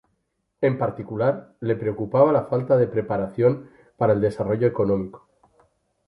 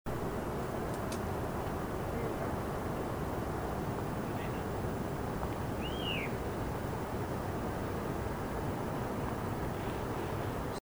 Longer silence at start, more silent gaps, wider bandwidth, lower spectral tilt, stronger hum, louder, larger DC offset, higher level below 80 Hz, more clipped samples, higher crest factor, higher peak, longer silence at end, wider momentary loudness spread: first, 0.6 s vs 0.05 s; neither; second, 10.5 kHz vs over 20 kHz; first, -10 dB/octave vs -6 dB/octave; neither; first, -23 LUFS vs -37 LUFS; neither; second, -54 dBFS vs -46 dBFS; neither; about the same, 18 dB vs 14 dB; first, -4 dBFS vs -22 dBFS; first, 0.9 s vs 0 s; first, 8 LU vs 1 LU